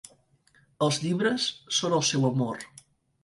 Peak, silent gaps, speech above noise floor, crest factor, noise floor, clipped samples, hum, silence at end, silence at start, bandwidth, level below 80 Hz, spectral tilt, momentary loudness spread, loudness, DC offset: -12 dBFS; none; 37 dB; 16 dB; -64 dBFS; under 0.1%; none; 0.55 s; 0.8 s; 11.5 kHz; -68 dBFS; -4 dB/octave; 8 LU; -26 LUFS; under 0.1%